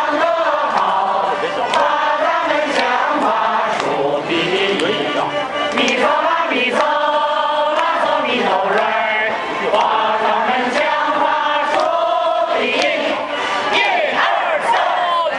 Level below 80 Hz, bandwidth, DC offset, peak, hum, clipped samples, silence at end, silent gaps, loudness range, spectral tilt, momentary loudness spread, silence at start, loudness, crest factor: -60 dBFS; 11.5 kHz; under 0.1%; 0 dBFS; none; under 0.1%; 0 s; none; 1 LU; -3 dB/octave; 3 LU; 0 s; -16 LUFS; 16 dB